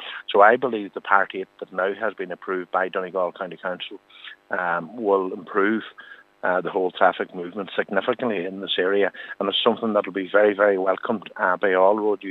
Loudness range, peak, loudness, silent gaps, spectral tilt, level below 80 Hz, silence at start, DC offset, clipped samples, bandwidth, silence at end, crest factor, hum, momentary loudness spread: 6 LU; 0 dBFS; -23 LUFS; none; -7 dB/octave; -82 dBFS; 0 s; under 0.1%; under 0.1%; 4.3 kHz; 0 s; 22 dB; none; 12 LU